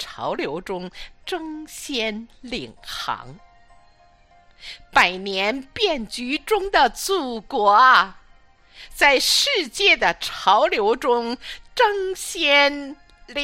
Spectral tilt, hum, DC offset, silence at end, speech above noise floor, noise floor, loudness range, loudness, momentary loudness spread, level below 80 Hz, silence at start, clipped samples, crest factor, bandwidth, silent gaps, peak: -1.5 dB/octave; none; under 0.1%; 0 s; 33 dB; -54 dBFS; 13 LU; -19 LUFS; 17 LU; -48 dBFS; 0 s; under 0.1%; 20 dB; 16 kHz; none; -2 dBFS